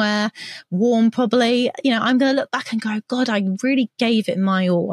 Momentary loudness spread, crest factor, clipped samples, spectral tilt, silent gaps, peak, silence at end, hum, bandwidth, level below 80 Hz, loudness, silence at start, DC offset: 7 LU; 14 dB; under 0.1%; -5.5 dB/octave; none; -4 dBFS; 0 s; none; 11.5 kHz; -76 dBFS; -19 LUFS; 0 s; under 0.1%